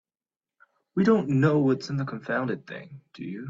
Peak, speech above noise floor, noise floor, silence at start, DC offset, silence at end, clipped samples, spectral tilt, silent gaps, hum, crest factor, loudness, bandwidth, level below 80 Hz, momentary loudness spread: -10 dBFS; over 65 dB; under -90 dBFS; 0.95 s; under 0.1%; 0 s; under 0.1%; -8 dB/octave; none; none; 18 dB; -25 LUFS; 7.6 kHz; -64 dBFS; 19 LU